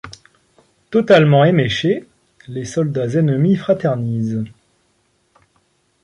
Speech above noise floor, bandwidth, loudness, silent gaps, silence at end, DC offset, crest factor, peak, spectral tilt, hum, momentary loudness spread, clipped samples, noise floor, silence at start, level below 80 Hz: 47 dB; 10.5 kHz; -16 LUFS; none; 1.55 s; under 0.1%; 16 dB; -2 dBFS; -7 dB/octave; none; 15 LU; under 0.1%; -62 dBFS; 0.05 s; -54 dBFS